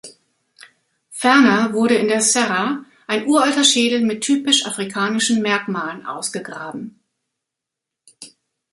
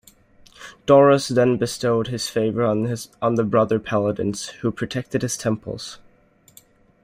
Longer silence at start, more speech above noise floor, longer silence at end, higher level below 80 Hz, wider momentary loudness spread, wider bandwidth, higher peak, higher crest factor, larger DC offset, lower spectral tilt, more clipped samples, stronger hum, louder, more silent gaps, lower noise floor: second, 0.05 s vs 0.6 s; first, 66 dB vs 36 dB; second, 0.45 s vs 1.1 s; second, -66 dBFS vs -54 dBFS; about the same, 15 LU vs 14 LU; second, 11.5 kHz vs 16 kHz; about the same, -2 dBFS vs -2 dBFS; about the same, 18 dB vs 18 dB; neither; second, -2.5 dB/octave vs -5.5 dB/octave; neither; neither; first, -17 LUFS vs -21 LUFS; neither; first, -83 dBFS vs -56 dBFS